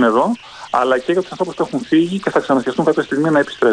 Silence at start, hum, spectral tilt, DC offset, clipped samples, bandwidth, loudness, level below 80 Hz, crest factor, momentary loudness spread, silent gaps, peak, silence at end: 0 s; none; -6 dB/octave; under 0.1%; under 0.1%; 10.5 kHz; -17 LUFS; -58 dBFS; 14 dB; 6 LU; none; -2 dBFS; 0 s